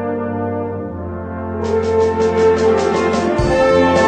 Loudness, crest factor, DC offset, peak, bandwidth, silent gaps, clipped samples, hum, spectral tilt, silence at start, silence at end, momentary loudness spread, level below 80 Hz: -16 LUFS; 14 dB; under 0.1%; -2 dBFS; 9.4 kHz; none; under 0.1%; none; -6 dB/octave; 0 s; 0 s; 12 LU; -34 dBFS